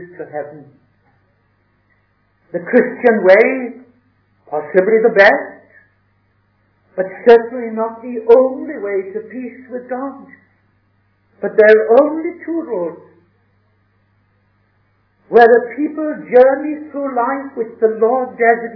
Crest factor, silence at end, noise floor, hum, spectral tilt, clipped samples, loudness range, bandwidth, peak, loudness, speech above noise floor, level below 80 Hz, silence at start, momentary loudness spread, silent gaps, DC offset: 16 dB; 0 s; -60 dBFS; 50 Hz at -55 dBFS; -7.5 dB/octave; 0.4%; 5 LU; 5.4 kHz; 0 dBFS; -14 LUFS; 46 dB; -62 dBFS; 0 s; 18 LU; none; under 0.1%